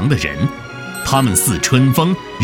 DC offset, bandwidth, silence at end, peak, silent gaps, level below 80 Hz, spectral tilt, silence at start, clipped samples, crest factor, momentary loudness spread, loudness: under 0.1%; 19 kHz; 0 s; 0 dBFS; none; -38 dBFS; -4.5 dB/octave; 0 s; under 0.1%; 16 dB; 11 LU; -15 LUFS